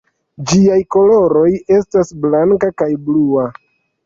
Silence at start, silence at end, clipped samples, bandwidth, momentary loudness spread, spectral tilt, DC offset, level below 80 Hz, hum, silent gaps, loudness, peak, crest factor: 0.4 s; 0.55 s; under 0.1%; 7.8 kHz; 7 LU; -6.5 dB/octave; under 0.1%; -46 dBFS; none; none; -13 LUFS; -2 dBFS; 10 dB